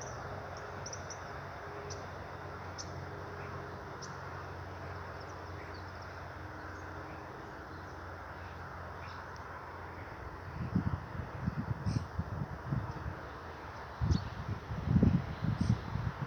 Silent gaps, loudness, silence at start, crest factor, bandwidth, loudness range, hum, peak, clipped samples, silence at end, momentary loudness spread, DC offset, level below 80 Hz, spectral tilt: none; -40 LUFS; 0 s; 24 dB; 9.2 kHz; 10 LU; none; -14 dBFS; under 0.1%; 0 s; 11 LU; under 0.1%; -50 dBFS; -6.5 dB/octave